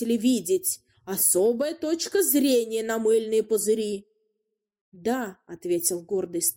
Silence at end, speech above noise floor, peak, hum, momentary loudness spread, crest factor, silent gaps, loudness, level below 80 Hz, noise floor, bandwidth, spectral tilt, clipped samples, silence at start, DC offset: 0.05 s; 56 dB; -8 dBFS; none; 12 LU; 18 dB; 4.81-4.92 s; -24 LUFS; -70 dBFS; -80 dBFS; 16.5 kHz; -3 dB/octave; under 0.1%; 0 s; under 0.1%